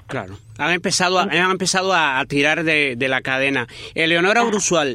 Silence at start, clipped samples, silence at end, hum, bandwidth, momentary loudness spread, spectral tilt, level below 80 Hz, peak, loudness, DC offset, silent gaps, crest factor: 0.1 s; under 0.1%; 0 s; none; 15.5 kHz; 8 LU; -3 dB/octave; -54 dBFS; -2 dBFS; -17 LUFS; under 0.1%; none; 16 dB